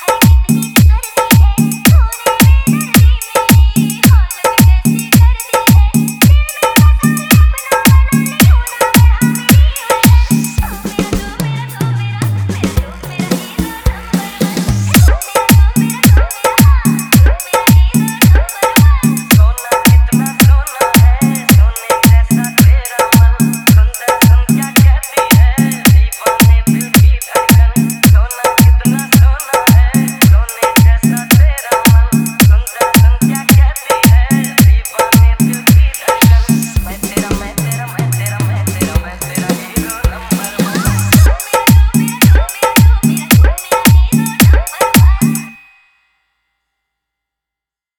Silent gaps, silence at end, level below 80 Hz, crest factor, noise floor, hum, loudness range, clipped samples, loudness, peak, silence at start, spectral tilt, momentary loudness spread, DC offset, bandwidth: none; 2.45 s; -14 dBFS; 10 dB; -85 dBFS; none; 5 LU; 0.7%; -10 LUFS; 0 dBFS; 0 s; -5 dB/octave; 8 LU; under 0.1%; over 20 kHz